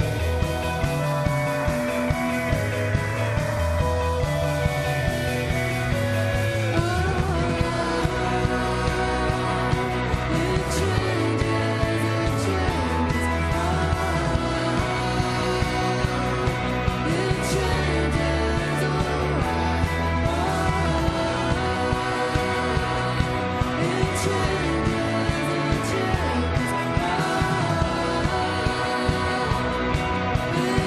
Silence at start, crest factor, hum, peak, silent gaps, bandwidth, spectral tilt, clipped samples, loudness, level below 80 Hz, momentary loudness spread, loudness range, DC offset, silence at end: 0 s; 16 dB; none; -8 dBFS; none; 13.5 kHz; -5.5 dB/octave; under 0.1%; -24 LUFS; -32 dBFS; 1 LU; 1 LU; under 0.1%; 0 s